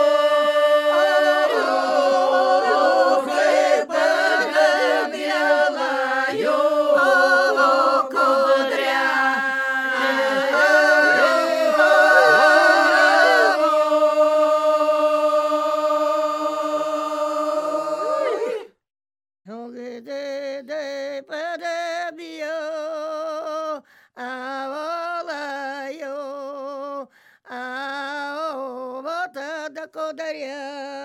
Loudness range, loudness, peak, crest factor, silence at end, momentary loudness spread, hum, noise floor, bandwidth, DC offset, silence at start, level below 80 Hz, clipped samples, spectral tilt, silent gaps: 15 LU; -19 LUFS; -2 dBFS; 18 dB; 0 s; 17 LU; none; -45 dBFS; 14 kHz; under 0.1%; 0 s; -80 dBFS; under 0.1%; -2 dB/octave; none